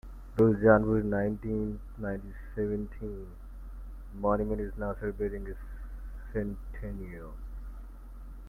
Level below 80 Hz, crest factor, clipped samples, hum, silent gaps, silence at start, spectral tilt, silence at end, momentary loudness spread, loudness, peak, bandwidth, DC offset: -42 dBFS; 24 dB; under 0.1%; none; none; 0.05 s; -10.5 dB/octave; 0 s; 23 LU; -31 LUFS; -8 dBFS; 14.5 kHz; under 0.1%